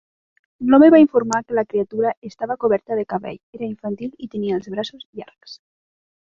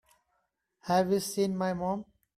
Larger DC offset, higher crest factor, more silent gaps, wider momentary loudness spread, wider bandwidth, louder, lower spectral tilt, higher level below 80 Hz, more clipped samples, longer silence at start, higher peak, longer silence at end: neither; about the same, 18 dB vs 18 dB; first, 2.17-2.22 s, 3.43-3.53 s, 5.05-5.13 s vs none; first, 19 LU vs 10 LU; second, 7.8 kHz vs 14.5 kHz; first, -19 LUFS vs -30 LUFS; about the same, -6 dB/octave vs -5.5 dB/octave; first, -60 dBFS vs -66 dBFS; neither; second, 0.6 s vs 0.85 s; first, -2 dBFS vs -14 dBFS; first, 0.85 s vs 0.35 s